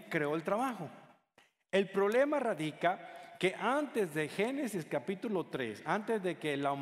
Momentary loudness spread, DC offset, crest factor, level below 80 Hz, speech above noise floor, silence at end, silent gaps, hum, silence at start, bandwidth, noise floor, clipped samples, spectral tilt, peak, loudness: 7 LU; under 0.1%; 20 dB; -80 dBFS; 36 dB; 0 s; none; none; 0 s; 15.5 kHz; -70 dBFS; under 0.1%; -5.5 dB/octave; -16 dBFS; -34 LUFS